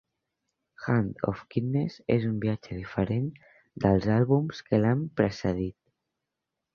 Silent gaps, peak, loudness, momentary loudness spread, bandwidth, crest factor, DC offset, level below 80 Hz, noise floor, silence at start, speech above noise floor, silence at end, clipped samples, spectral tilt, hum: none; -8 dBFS; -28 LUFS; 9 LU; 7 kHz; 22 dB; under 0.1%; -52 dBFS; -86 dBFS; 0.8 s; 59 dB; 1.05 s; under 0.1%; -8.5 dB/octave; none